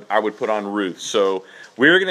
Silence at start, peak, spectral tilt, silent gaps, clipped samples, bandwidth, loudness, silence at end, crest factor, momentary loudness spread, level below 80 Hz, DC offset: 0 s; 0 dBFS; -3.5 dB/octave; none; under 0.1%; 13 kHz; -20 LUFS; 0 s; 20 dB; 11 LU; -72 dBFS; under 0.1%